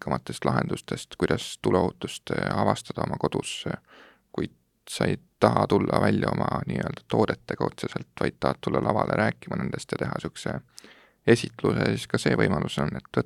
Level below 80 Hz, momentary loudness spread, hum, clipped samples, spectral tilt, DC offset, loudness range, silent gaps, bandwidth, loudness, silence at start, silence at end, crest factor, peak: -54 dBFS; 11 LU; none; under 0.1%; -6 dB/octave; under 0.1%; 3 LU; none; 14.5 kHz; -27 LUFS; 0 s; 0 s; 24 dB; -2 dBFS